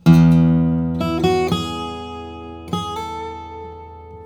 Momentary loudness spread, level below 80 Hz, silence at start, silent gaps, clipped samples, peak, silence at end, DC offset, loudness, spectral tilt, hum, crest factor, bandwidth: 21 LU; -42 dBFS; 0.05 s; none; under 0.1%; 0 dBFS; 0 s; under 0.1%; -18 LUFS; -7.5 dB/octave; none; 18 dB; 9.8 kHz